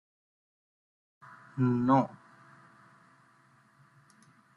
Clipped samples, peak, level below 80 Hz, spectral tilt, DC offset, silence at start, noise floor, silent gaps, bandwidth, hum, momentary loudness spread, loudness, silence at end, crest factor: under 0.1%; -12 dBFS; -70 dBFS; -9.5 dB/octave; under 0.1%; 1.55 s; -64 dBFS; none; 7 kHz; none; 20 LU; -28 LUFS; 2.5 s; 22 dB